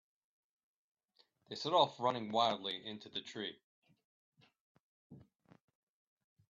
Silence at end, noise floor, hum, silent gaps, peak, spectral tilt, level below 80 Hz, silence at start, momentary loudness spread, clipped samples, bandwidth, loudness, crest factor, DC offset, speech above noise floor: 1.3 s; -75 dBFS; none; 3.64-3.82 s, 4.05-4.32 s, 4.61-5.10 s; -16 dBFS; -2 dB/octave; -86 dBFS; 1.5 s; 13 LU; under 0.1%; 7.4 kHz; -37 LUFS; 24 dB; under 0.1%; 38 dB